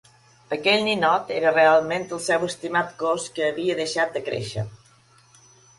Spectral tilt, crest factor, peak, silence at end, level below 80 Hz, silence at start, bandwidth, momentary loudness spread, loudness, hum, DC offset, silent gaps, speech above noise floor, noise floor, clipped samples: -4 dB/octave; 18 dB; -6 dBFS; 1.05 s; -60 dBFS; 0.5 s; 11.5 kHz; 11 LU; -22 LUFS; none; under 0.1%; none; 34 dB; -56 dBFS; under 0.1%